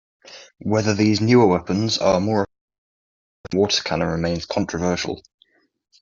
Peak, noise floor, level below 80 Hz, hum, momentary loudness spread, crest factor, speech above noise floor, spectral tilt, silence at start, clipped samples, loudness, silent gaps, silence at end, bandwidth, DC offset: -2 dBFS; -61 dBFS; -52 dBFS; none; 11 LU; 18 dB; 42 dB; -5.5 dB/octave; 0.3 s; under 0.1%; -20 LUFS; 2.61-2.68 s, 2.78-3.44 s; 0.8 s; 7.6 kHz; under 0.1%